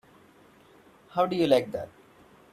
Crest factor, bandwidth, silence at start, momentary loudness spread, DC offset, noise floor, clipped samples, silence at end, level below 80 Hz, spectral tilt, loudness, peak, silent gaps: 22 dB; 14.5 kHz; 1.15 s; 15 LU; under 0.1%; -57 dBFS; under 0.1%; 0.65 s; -66 dBFS; -6 dB/octave; -27 LUFS; -8 dBFS; none